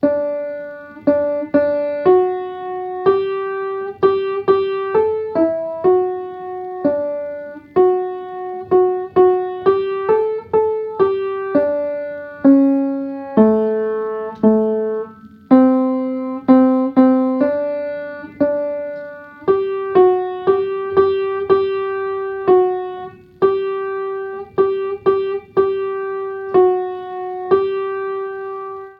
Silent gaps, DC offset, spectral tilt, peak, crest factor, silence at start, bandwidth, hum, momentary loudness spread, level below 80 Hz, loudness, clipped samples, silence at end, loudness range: none; under 0.1%; -9.5 dB/octave; 0 dBFS; 16 dB; 0 s; 4.8 kHz; none; 13 LU; -58 dBFS; -18 LUFS; under 0.1%; 0.05 s; 4 LU